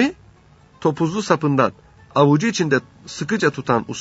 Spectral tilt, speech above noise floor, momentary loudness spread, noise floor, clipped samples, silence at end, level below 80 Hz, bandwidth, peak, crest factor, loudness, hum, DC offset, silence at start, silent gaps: -5.5 dB/octave; 32 dB; 8 LU; -51 dBFS; under 0.1%; 0 s; -56 dBFS; 8 kHz; 0 dBFS; 20 dB; -20 LUFS; none; under 0.1%; 0 s; none